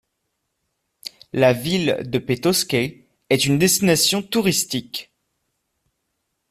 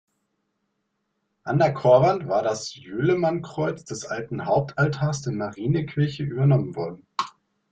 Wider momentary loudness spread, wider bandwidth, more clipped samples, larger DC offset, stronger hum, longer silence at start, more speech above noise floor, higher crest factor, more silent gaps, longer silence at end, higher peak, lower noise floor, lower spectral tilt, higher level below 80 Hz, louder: first, 16 LU vs 13 LU; first, 16 kHz vs 8.8 kHz; neither; neither; neither; second, 1.05 s vs 1.45 s; about the same, 56 dB vs 53 dB; about the same, 20 dB vs 20 dB; neither; first, 1.45 s vs 0.45 s; about the same, -2 dBFS vs -4 dBFS; about the same, -75 dBFS vs -76 dBFS; second, -3.5 dB/octave vs -6.5 dB/octave; about the same, -56 dBFS vs -58 dBFS; first, -19 LUFS vs -24 LUFS